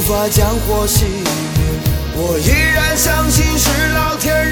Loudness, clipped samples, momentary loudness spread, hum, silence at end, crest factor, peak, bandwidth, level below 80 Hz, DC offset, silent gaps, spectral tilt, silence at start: -14 LUFS; under 0.1%; 6 LU; none; 0 s; 14 dB; 0 dBFS; 19.5 kHz; -20 dBFS; under 0.1%; none; -4 dB/octave; 0 s